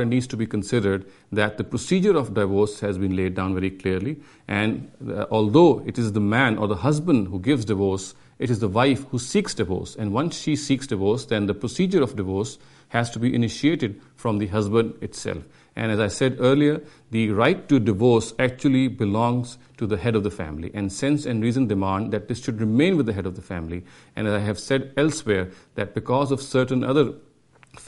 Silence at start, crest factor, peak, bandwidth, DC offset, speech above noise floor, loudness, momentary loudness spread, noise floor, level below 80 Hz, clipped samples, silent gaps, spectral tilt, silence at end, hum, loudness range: 0 s; 20 dB; -2 dBFS; 11.5 kHz; under 0.1%; 30 dB; -23 LUFS; 11 LU; -53 dBFS; -52 dBFS; under 0.1%; none; -6 dB/octave; 0 s; none; 4 LU